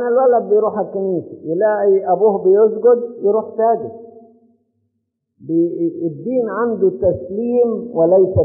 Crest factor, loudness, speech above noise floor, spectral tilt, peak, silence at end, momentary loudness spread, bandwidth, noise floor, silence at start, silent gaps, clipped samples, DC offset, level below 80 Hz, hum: 12 dB; -16 LUFS; 57 dB; -5 dB/octave; -4 dBFS; 0 s; 9 LU; 2.6 kHz; -72 dBFS; 0 s; none; under 0.1%; under 0.1%; -52 dBFS; none